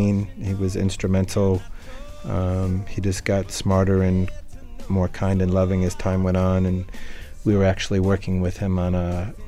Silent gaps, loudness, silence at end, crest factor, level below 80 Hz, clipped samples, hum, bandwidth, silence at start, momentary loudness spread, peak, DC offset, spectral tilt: none; -22 LUFS; 0 s; 14 dB; -36 dBFS; under 0.1%; none; 12 kHz; 0 s; 11 LU; -8 dBFS; under 0.1%; -7 dB/octave